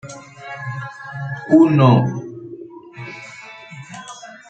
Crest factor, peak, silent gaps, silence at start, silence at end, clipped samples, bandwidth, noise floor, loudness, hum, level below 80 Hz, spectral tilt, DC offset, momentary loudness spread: 18 dB; -2 dBFS; none; 0.05 s; 0.2 s; under 0.1%; 8.6 kHz; -38 dBFS; -16 LUFS; none; -60 dBFS; -8 dB/octave; under 0.1%; 24 LU